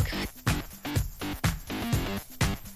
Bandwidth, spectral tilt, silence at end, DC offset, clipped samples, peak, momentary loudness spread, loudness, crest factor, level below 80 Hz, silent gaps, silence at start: 16 kHz; -4.5 dB/octave; 0 s; under 0.1%; under 0.1%; -14 dBFS; 4 LU; -31 LUFS; 18 dB; -38 dBFS; none; 0 s